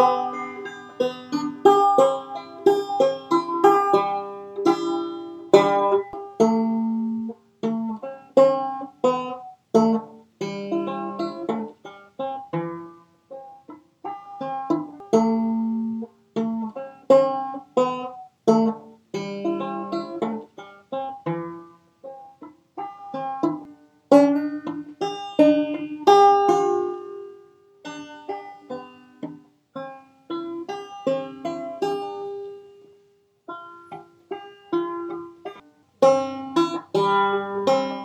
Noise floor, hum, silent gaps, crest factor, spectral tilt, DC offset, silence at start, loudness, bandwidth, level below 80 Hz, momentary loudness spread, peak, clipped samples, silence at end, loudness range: -61 dBFS; none; none; 24 dB; -6 dB/octave; under 0.1%; 0 s; -23 LUFS; 15 kHz; -74 dBFS; 20 LU; 0 dBFS; under 0.1%; 0 s; 13 LU